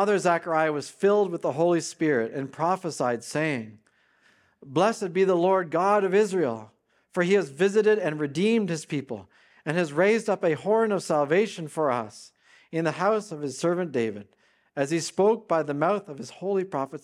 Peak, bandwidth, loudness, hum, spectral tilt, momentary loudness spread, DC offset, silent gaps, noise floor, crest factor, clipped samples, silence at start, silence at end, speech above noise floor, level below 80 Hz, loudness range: -8 dBFS; 12.5 kHz; -25 LUFS; none; -5.5 dB/octave; 10 LU; under 0.1%; none; -63 dBFS; 18 dB; under 0.1%; 0 s; 0.05 s; 39 dB; -78 dBFS; 4 LU